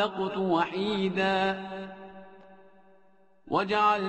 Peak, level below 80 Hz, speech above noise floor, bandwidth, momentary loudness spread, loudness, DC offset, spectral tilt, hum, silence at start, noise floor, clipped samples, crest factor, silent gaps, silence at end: -12 dBFS; -64 dBFS; 36 dB; 8.6 kHz; 20 LU; -28 LUFS; under 0.1%; -6 dB/octave; none; 0 s; -64 dBFS; under 0.1%; 18 dB; none; 0 s